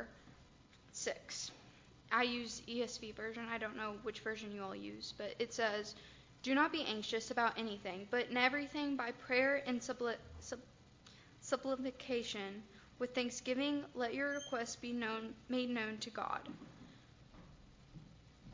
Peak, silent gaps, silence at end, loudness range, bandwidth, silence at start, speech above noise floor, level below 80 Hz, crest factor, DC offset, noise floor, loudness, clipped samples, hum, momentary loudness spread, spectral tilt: -16 dBFS; none; 0 s; 6 LU; 7.6 kHz; 0 s; 24 dB; -70 dBFS; 24 dB; under 0.1%; -64 dBFS; -40 LUFS; under 0.1%; none; 19 LU; -3 dB/octave